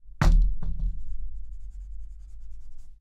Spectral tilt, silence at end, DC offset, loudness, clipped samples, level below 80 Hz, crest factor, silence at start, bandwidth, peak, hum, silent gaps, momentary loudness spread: -6.5 dB/octave; 0.05 s; under 0.1%; -29 LUFS; under 0.1%; -26 dBFS; 16 dB; 0.05 s; 7.8 kHz; -8 dBFS; none; none; 24 LU